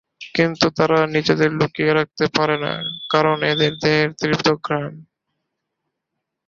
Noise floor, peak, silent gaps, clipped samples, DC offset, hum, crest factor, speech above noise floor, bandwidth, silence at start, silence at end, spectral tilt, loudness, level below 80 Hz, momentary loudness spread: -79 dBFS; 0 dBFS; none; under 0.1%; under 0.1%; none; 20 dB; 61 dB; 7.4 kHz; 0.2 s; 1.45 s; -5.5 dB/octave; -19 LUFS; -56 dBFS; 7 LU